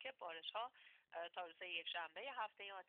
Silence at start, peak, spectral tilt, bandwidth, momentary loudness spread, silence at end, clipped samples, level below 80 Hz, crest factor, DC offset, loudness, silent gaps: 0 s; -34 dBFS; 3 dB/octave; 4.5 kHz; 7 LU; 0.05 s; under 0.1%; under -90 dBFS; 18 dB; under 0.1%; -49 LUFS; none